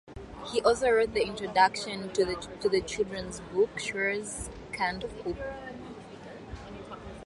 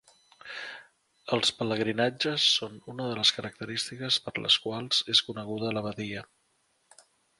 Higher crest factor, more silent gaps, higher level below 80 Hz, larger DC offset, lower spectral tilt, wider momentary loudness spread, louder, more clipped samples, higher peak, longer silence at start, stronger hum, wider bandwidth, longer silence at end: about the same, 22 dB vs 24 dB; neither; first, -52 dBFS vs -68 dBFS; neither; about the same, -3.5 dB/octave vs -3 dB/octave; first, 19 LU vs 16 LU; about the same, -29 LUFS vs -27 LUFS; neither; about the same, -8 dBFS vs -6 dBFS; second, 0.05 s vs 0.45 s; neither; about the same, 11.5 kHz vs 11.5 kHz; second, 0 s vs 1.15 s